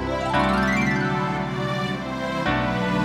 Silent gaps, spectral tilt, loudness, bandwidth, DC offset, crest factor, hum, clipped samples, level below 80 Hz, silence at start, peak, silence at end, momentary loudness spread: none; -6 dB/octave; -23 LUFS; 13.5 kHz; under 0.1%; 16 dB; none; under 0.1%; -40 dBFS; 0 s; -8 dBFS; 0 s; 6 LU